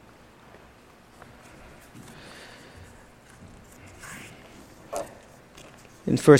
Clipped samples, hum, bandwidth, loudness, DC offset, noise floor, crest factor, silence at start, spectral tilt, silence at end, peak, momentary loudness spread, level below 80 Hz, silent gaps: under 0.1%; none; 16 kHz; -35 LUFS; under 0.1%; -53 dBFS; 28 dB; 4.05 s; -6.5 dB/octave; 0 s; -2 dBFS; 15 LU; -58 dBFS; none